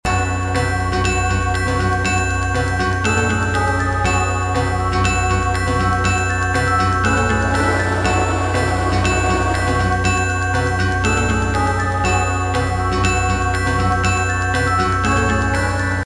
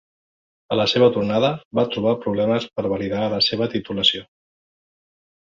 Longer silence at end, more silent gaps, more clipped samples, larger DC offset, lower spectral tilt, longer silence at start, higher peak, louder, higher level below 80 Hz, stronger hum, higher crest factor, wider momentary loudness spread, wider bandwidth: second, 0 s vs 1.35 s; second, none vs 1.65-1.71 s; neither; first, 0.8% vs under 0.1%; about the same, -5 dB/octave vs -5.5 dB/octave; second, 0.05 s vs 0.7 s; about the same, -4 dBFS vs -2 dBFS; first, -17 LUFS vs -20 LUFS; first, -28 dBFS vs -56 dBFS; neither; second, 14 dB vs 20 dB; second, 2 LU vs 7 LU; first, 11 kHz vs 7.6 kHz